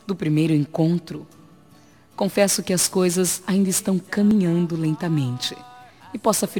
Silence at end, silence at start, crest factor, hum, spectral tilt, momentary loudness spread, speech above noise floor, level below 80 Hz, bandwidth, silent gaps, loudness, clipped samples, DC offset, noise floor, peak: 0 s; 0.05 s; 18 dB; none; -5 dB/octave; 9 LU; 31 dB; -60 dBFS; 19.5 kHz; none; -21 LUFS; under 0.1%; 0.1%; -52 dBFS; -4 dBFS